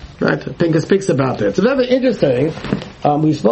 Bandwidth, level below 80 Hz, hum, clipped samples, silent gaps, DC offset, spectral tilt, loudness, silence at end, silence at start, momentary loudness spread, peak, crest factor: 8.6 kHz; -44 dBFS; none; under 0.1%; none; under 0.1%; -7 dB/octave; -16 LUFS; 0 s; 0 s; 5 LU; 0 dBFS; 14 dB